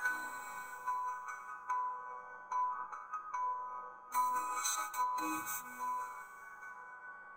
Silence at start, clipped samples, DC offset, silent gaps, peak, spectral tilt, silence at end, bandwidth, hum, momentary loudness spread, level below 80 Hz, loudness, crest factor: 0 s; under 0.1%; under 0.1%; none; -20 dBFS; 0 dB/octave; 0 s; 16.5 kHz; none; 14 LU; -84 dBFS; -39 LUFS; 20 dB